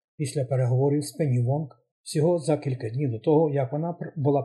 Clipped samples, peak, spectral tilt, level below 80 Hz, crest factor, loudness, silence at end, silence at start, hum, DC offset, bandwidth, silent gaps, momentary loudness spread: under 0.1%; -10 dBFS; -7.5 dB/octave; -70 dBFS; 14 dB; -26 LUFS; 0 s; 0.2 s; none; under 0.1%; 12 kHz; 1.91-2.04 s; 9 LU